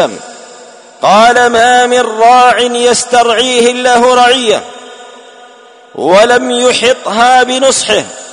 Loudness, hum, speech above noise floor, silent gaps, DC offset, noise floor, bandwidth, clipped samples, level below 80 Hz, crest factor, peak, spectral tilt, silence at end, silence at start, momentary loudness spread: -7 LUFS; none; 29 dB; none; under 0.1%; -37 dBFS; 11 kHz; 0.4%; -48 dBFS; 8 dB; 0 dBFS; -2 dB/octave; 0 s; 0 s; 7 LU